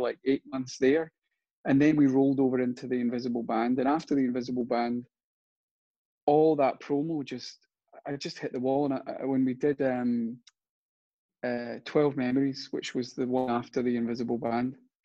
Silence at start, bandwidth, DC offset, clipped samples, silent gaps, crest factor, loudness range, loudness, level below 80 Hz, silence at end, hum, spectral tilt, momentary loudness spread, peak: 0 s; 7.8 kHz; under 0.1%; under 0.1%; 1.53-1.64 s, 5.23-6.27 s, 10.69-11.29 s; 18 dB; 4 LU; -29 LUFS; -70 dBFS; 0.3 s; none; -7 dB/octave; 13 LU; -12 dBFS